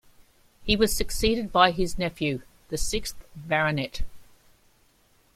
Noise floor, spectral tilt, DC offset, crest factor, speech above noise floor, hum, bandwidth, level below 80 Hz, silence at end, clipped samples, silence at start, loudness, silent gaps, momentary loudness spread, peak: -62 dBFS; -4 dB/octave; under 0.1%; 24 dB; 37 dB; none; 16 kHz; -38 dBFS; 1.15 s; under 0.1%; 0.6 s; -26 LUFS; none; 16 LU; -4 dBFS